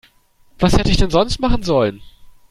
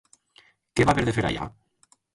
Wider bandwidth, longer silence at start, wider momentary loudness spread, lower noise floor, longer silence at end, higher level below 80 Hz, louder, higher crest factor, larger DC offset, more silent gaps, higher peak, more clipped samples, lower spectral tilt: first, 13 kHz vs 11.5 kHz; second, 0.6 s vs 0.75 s; second, 4 LU vs 12 LU; second, -52 dBFS vs -64 dBFS; second, 0.2 s vs 0.65 s; first, -24 dBFS vs -44 dBFS; first, -17 LUFS vs -24 LUFS; second, 16 dB vs 22 dB; neither; neither; first, -2 dBFS vs -6 dBFS; neither; about the same, -6 dB/octave vs -6 dB/octave